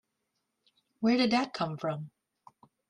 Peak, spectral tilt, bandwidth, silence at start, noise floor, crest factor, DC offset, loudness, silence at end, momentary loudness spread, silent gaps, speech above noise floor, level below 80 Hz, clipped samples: -14 dBFS; -6 dB/octave; 10.5 kHz; 1 s; -82 dBFS; 20 dB; under 0.1%; -30 LUFS; 0.8 s; 13 LU; none; 53 dB; -74 dBFS; under 0.1%